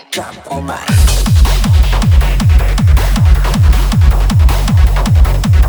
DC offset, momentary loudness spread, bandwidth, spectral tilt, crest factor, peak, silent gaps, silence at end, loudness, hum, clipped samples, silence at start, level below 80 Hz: under 0.1%; 8 LU; over 20 kHz; -5.5 dB/octave; 8 dB; 0 dBFS; none; 0 s; -11 LUFS; none; under 0.1%; 0.1 s; -10 dBFS